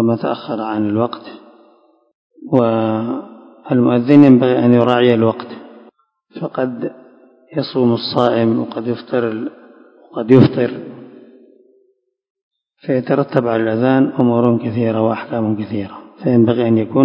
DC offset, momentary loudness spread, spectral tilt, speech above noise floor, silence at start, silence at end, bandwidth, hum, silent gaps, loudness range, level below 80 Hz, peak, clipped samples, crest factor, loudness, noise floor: under 0.1%; 16 LU; -9.5 dB/octave; 47 dB; 0 s; 0 s; 5.4 kHz; none; 2.15-2.30 s, 12.30-12.35 s, 12.42-12.51 s; 7 LU; -56 dBFS; 0 dBFS; 0.2%; 16 dB; -15 LUFS; -61 dBFS